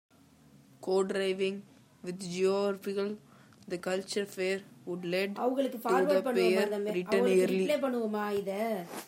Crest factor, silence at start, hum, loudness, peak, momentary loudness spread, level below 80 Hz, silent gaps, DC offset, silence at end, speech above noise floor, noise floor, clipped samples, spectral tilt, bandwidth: 16 dB; 0.8 s; none; -31 LUFS; -14 dBFS; 12 LU; -80 dBFS; none; under 0.1%; 0 s; 29 dB; -60 dBFS; under 0.1%; -5 dB/octave; 16 kHz